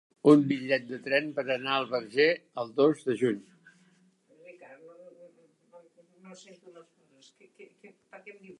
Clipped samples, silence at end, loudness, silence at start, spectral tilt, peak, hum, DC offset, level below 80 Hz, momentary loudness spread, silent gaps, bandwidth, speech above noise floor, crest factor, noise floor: under 0.1%; 0.05 s; -27 LUFS; 0.25 s; -6.5 dB/octave; -6 dBFS; none; under 0.1%; -82 dBFS; 27 LU; none; 10.5 kHz; 37 dB; 24 dB; -65 dBFS